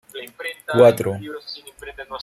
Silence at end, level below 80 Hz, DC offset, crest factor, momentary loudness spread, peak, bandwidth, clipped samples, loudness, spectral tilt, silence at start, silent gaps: 0 s; -56 dBFS; under 0.1%; 20 dB; 22 LU; 0 dBFS; 15.5 kHz; under 0.1%; -18 LUFS; -5.5 dB/octave; 0.15 s; none